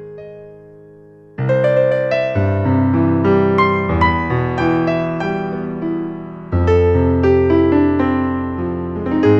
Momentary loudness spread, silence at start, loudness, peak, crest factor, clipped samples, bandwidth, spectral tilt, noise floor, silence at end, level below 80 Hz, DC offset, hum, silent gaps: 10 LU; 0 s; -16 LUFS; -2 dBFS; 14 dB; under 0.1%; 6.8 kHz; -9 dB/octave; -42 dBFS; 0 s; -34 dBFS; under 0.1%; none; none